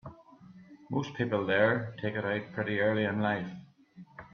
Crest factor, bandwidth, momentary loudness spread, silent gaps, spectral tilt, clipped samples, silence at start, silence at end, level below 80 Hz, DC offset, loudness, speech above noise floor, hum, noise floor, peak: 20 dB; 6.8 kHz; 22 LU; none; -7.5 dB/octave; under 0.1%; 0.05 s; 0.05 s; -68 dBFS; under 0.1%; -31 LUFS; 24 dB; none; -54 dBFS; -14 dBFS